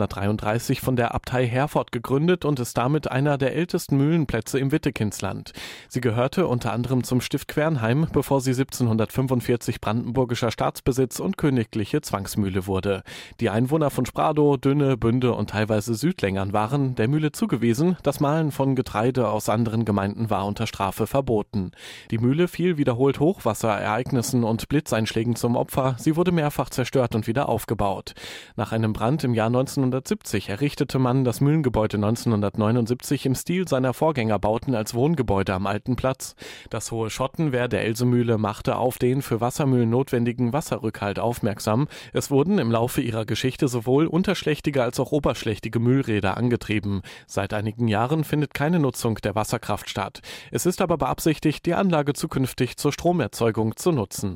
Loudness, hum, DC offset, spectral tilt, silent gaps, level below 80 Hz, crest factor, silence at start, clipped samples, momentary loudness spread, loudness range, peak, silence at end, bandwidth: -23 LUFS; none; under 0.1%; -6.5 dB/octave; none; -48 dBFS; 14 dB; 0 s; under 0.1%; 6 LU; 2 LU; -10 dBFS; 0 s; 16.5 kHz